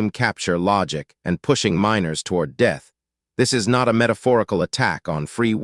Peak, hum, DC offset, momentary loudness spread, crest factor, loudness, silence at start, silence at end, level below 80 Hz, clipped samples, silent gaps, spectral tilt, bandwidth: -2 dBFS; none; under 0.1%; 9 LU; 18 dB; -20 LUFS; 0 s; 0 s; -54 dBFS; under 0.1%; none; -5 dB/octave; 12 kHz